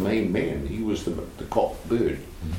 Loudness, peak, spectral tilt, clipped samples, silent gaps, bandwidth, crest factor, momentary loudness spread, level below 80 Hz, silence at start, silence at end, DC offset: -27 LUFS; -8 dBFS; -7 dB/octave; under 0.1%; none; 16.5 kHz; 18 dB; 7 LU; -40 dBFS; 0 s; 0 s; under 0.1%